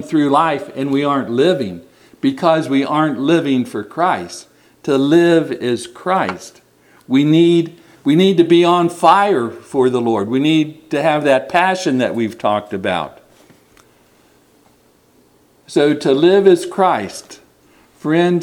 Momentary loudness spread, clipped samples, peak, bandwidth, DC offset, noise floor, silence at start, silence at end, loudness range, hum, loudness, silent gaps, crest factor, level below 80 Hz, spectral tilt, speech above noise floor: 11 LU; under 0.1%; 0 dBFS; 12.5 kHz; under 0.1%; -53 dBFS; 0 s; 0 s; 8 LU; none; -15 LUFS; none; 16 dB; -62 dBFS; -6 dB/octave; 39 dB